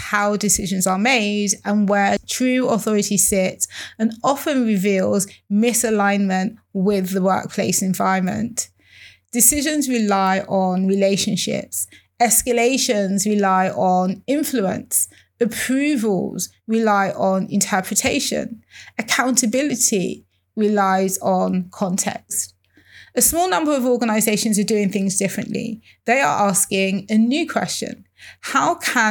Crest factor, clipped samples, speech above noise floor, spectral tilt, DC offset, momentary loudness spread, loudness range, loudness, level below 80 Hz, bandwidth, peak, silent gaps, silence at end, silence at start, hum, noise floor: 20 dB; under 0.1%; 29 dB; -3.5 dB/octave; under 0.1%; 9 LU; 2 LU; -19 LUFS; -52 dBFS; 20 kHz; 0 dBFS; none; 0 s; 0 s; none; -48 dBFS